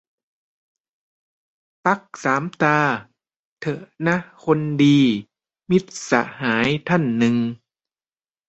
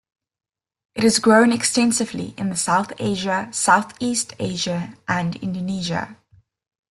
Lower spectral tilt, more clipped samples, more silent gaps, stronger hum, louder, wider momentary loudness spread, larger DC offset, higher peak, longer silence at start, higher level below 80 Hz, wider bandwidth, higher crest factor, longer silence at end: first, -6 dB/octave vs -3.5 dB/octave; neither; first, 3.36-3.57 s vs none; neither; about the same, -20 LUFS vs -20 LUFS; about the same, 12 LU vs 12 LU; neither; about the same, -2 dBFS vs -2 dBFS; first, 1.85 s vs 0.95 s; about the same, -60 dBFS vs -58 dBFS; second, 8.2 kHz vs 12.5 kHz; about the same, 20 dB vs 20 dB; first, 0.95 s vs 0.75 s